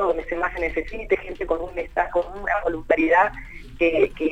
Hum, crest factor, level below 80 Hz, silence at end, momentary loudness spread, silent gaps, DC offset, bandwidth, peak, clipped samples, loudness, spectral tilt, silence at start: none; 16 dB; -40 dBFS; 0 s; 9 LU; none; under 0.1%; 9 kHz; -6 dBFS; under 0.1%; -23 LUFS; -6.5 dB/octave; 0 s